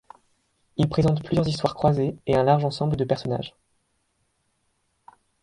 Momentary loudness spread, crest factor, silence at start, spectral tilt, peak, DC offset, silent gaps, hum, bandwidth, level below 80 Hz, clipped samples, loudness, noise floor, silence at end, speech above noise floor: 9 LU; 20 dB; 0.8 s; -7.5 dB/octave; -6 dBFS; under 0.1%; none; none; 11 kHz; -48 dBFS; under 0.1%; -23 LUFS; -71 dBFS; 1.95 s; 49 dB